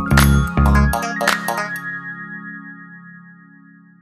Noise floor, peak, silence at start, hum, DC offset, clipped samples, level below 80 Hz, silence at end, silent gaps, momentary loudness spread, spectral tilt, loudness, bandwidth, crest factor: -46 dBFS; 0 dBFS; 0 s; none; under 0.1%; under 0.1%; -24 dBFS; 0.85 s; none; 22 LU; -5.5 dB/octave; -18 LUFS; 15.5 kHz; 18 dB